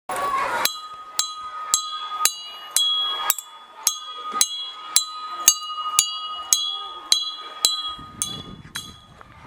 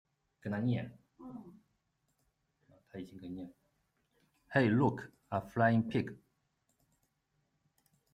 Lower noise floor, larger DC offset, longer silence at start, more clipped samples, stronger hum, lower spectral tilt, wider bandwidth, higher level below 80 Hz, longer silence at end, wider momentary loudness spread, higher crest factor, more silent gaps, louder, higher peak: second, -46 dBFS vs -80 dBFS; neither; second, 0.1 s vs 0.45 s; neither; neither; second, 1.5 dB/octave vs -8.5 dB/octave; first, over 20 kHz vs 8.6 kHz; first, -60 dBFS vs -72 dBFS; second, 0 s vs 1.95 s; second, 14 LU vs 21 LU; about the same, 26 dB vs 22 dB; neither; first, -22 LUFS vs -33 LUFS; first, 0 dBFS vs -16 dBFS